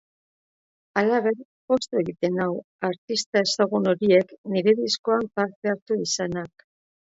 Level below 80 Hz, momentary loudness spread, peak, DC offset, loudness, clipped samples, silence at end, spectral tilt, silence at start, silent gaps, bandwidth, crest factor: -66 dBFS; 8 LU; -6 dBFS; under 0.1%; -24 LUFS; under 0.1%; 0.55 s; -4.5 dB/octave; 0.95 s; 1.45-1.68 s, 2.64-2.79 s, 2.98-3.08 s, 3.26-3.33 s, 4.38-4.44 s, 4.99-5.04 s, 5.56-5.62 s, 5.82-5.86 s; 8 kHz; 18 dB